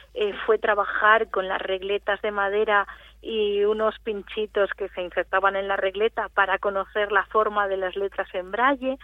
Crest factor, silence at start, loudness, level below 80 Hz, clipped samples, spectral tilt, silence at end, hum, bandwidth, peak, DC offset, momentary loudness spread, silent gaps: 20 dB; 0.15 s; -24 LUFS; -54 dBFS; under 0.1%; -5.5 dB/octave; 0.1 s; none; 4.1 kHz; -4 dBFS; under 0.1%; 8 LU; none